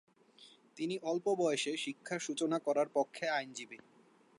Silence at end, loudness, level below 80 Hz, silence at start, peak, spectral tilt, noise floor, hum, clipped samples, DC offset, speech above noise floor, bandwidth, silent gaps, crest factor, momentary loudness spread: 0.6 s; -36 LUFS; under -90 dBFS; 0.4 s; -18 dBFS; -3.5 dB/octave; -62 dBFS; none; under 0.1%; under 0.1%; 26 dB; 11.5 kHz; none; 18 dB; 14 LU